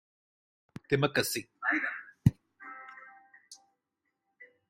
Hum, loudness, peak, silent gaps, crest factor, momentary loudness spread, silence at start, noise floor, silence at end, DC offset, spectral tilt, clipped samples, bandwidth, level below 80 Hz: none; -31 LUFS; -8 dBFS; none; 26 dB; 23 LU; 0.9 s; -84 dBFS; 0.25 s; under 0.1%; -5 dB/octave; under 0.1%; 16 kHz; -58 dBFS